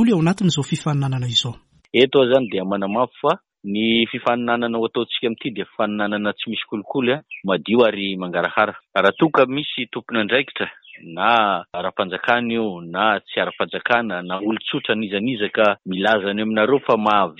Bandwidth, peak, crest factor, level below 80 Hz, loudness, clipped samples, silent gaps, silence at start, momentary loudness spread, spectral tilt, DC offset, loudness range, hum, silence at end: 10 kHz; -2 dBFS; 18 dB; -60 dBFS; -20 LUFS; under 0.1%; none; 0 s; 9 LU; -5.5 dB/octave; under 0.1%; 2 LU; none; 0.05 s